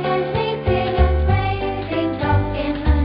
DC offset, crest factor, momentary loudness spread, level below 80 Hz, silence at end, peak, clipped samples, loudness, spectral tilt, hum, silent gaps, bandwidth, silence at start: under 0.1%; 16 dB; 5 LU; -24 dBFS; 0 s; -2 dBFS; under 0.1%; -20 LUFS; -12 dB/octave; none; none; 5.2 kHz; 0 s